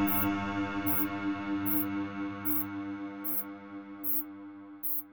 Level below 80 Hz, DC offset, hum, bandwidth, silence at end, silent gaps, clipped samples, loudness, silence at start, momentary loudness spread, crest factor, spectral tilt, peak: -62 dBFS; under 0.1%; none; over 20 kHz; 0 s; none; under 0.1%; -31 LUFS; 0 s; 13 LU; 18 dB; -5 dB/octave; -14 dBFS